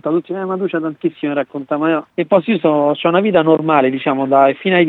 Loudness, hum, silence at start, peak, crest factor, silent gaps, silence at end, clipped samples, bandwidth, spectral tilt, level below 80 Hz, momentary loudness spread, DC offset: -15 LUFS; none; 0.05 s; 0 dBFS; 14 dB; none; 0 s; under 0.1%; 4.2 kHz; -9 dB/octave; -64 dBFS; 8 LU; under 0.1%